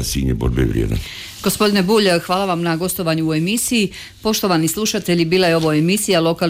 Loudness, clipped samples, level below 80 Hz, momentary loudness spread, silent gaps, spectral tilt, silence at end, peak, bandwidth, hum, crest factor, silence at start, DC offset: -17 LUFS; under 0.1%; -32 dBFS; 7 LU; none; -4.5 dB/octave; 0 s; -6 dBFS; 16.5 kHz; none; 12 dB; 0 s; under 0.1%